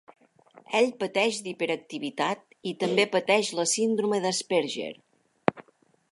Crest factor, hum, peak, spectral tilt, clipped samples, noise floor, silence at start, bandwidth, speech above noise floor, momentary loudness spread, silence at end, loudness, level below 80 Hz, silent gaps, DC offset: 26 dB; none; -2 dBFS; -3 dB/octave; under 0.1%; -61 dBFS; 0.1 s; 11.5 kHz; 34 dB; 9 LU; 0.5 s; -27 LUFS; -76 dBFS; none; under 0.1%